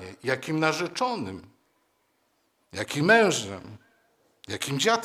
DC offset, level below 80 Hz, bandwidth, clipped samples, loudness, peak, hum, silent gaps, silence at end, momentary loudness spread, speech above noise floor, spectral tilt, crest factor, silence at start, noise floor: under 0.1%; -68 dBFS; 16 kHz; under 0.1%; -25 LUFS; -4 dBFS; none; none; 0 s; 20 LU; 45 dB; -4 dB/octave; 24 dB; 0 s; -71 dBFS